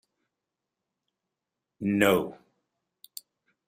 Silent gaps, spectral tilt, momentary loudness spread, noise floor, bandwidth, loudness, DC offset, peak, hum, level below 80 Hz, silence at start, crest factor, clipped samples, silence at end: none; -5 dB/octave; 22 LU; -87 dBFS; 15.5 kHz; -25 LUFS; under 0.1%; -8 dBFS; none; -68 dBFS; 1.8 s; 24 dB; under 0.1%; 1.35 s